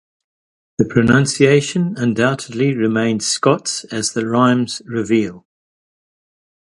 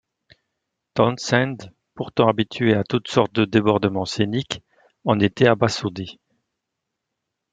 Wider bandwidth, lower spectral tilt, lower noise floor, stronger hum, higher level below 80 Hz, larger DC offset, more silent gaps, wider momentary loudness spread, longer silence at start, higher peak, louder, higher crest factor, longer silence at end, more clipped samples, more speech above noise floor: first, 11.5 kHz vs 9.4 kHz; about the same, -5 dB/octave vs -6 dB/octave; first, under -90 dBFS vs -81 dBFS; neither; first, -50 dBFS vs -58 dBFS; neither; neither; second, 8 LU vs 13 LU; second, 0.8 s vs 0.95 s; about the same, 0 dBFS vs -2 dBFS; first, -17 LUFS vs -21 LUFS; about the same, 18 dB vs 20 dB; about the same, 1.4 s vs 1.4 s; neither; first, over 74 dB vs 61 dB